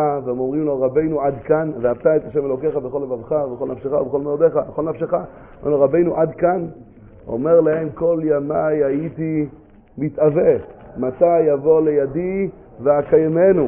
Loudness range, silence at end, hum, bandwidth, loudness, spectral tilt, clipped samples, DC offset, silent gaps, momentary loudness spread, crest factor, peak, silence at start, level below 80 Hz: 3 LU; 0 s; none; 3.1 kHz; -19 LUFS; -13 dB/octave; under 0.1%; under 0.1%; none; 10 LU; 16 dB; -2 dBFS; 0 s; -48 dBFS